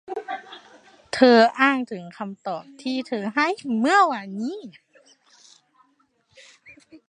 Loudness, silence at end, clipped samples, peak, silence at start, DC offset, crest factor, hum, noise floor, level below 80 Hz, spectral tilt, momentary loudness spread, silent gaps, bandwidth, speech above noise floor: -21 LUFS; 0.1 s; under 0.1%; -2 dBFS; 0.1 s; under 0.1%; 22 dB; none; -66 dBFS; -72 dBFS; -4.5 dB/octave; 19 LU; none; 10 kHz; 44 dB